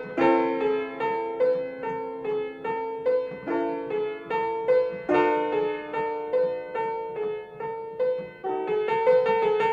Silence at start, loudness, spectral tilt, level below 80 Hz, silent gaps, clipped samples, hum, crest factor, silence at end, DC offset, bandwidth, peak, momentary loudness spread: 0 s; -26 LUFS; -7 dB/octave; -64 dBFS; none; under 0.1%; none; 18 dB; 0 s; under 0.1%; 7 kHz; -8 dBFS; 10 LU